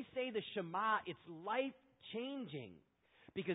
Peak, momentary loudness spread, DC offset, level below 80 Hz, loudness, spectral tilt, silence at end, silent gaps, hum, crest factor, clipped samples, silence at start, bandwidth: -24 dBFS; 13 LU; under 0.1%; -82 dBFS; -43 LUFS; -1 dB/octave; 0 s; none; none; 18 dB; under 0.1%; 0 s; 3.9 kHz